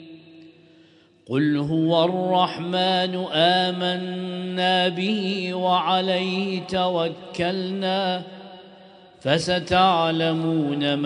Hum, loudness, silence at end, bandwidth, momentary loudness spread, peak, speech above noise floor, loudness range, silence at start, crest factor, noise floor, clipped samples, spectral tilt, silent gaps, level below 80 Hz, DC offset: none; -22 LUFS; 0 s; 10.5 kHz; 9 LU; -4 dBFS; 32 dB; 3 LU; 0 s; 18 dB; -54 dBFS; under 0.1%; -5.5 dB/octave; none; -58 dBFS; under 0.1%